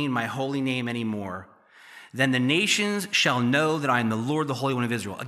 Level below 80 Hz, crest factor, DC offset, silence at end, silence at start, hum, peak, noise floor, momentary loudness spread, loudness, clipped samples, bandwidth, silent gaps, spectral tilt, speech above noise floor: -74 dBFS; 18 dB; under 0.1%; 0 s; 0 s; none; -8 dBFS; -49 dBFS; 9 LU; -24 LUFS; under 0.1%; 15 kHz; none; -4.5 dB/octave; 24 dB